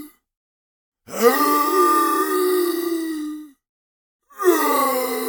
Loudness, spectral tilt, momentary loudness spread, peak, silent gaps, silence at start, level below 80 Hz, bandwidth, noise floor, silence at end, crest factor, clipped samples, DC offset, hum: -19 LUFS; -2.5 dB/octave; 13 LU; -2 dBFS; 0.37-0.92 s, 3.69-4.20 s; 0 s; -68 dBFS; over 20 kHz; under -90 dBFS; 0 s; 18 dB; under 0.1%; under 0.1%; none